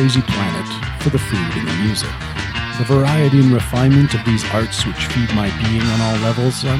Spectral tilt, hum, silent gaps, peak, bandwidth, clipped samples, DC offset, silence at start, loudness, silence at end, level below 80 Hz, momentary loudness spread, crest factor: -6 dB/octave; none; none; 0 dBFS; 14.5 kHz; under 0.1%; under 0.1%; 0 s; -17 LUFS; 0 s; -32 dBFS; 9 LU; 14 dB